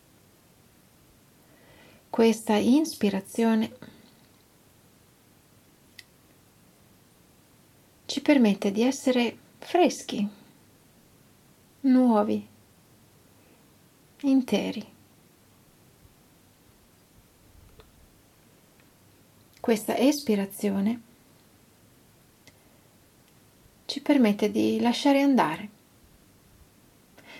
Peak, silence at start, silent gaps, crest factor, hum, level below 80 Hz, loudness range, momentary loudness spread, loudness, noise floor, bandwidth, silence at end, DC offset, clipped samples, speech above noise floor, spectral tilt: -8 dBFS; 2.15 s; none; 20 dB; none; -70 dBFS; 8 LU; 13 LU; -25 LUFS; -59 dBFS; 15.5 kHz; 0 s; under 0.1%; under 0.1%; 35 dB; -5 dB/octave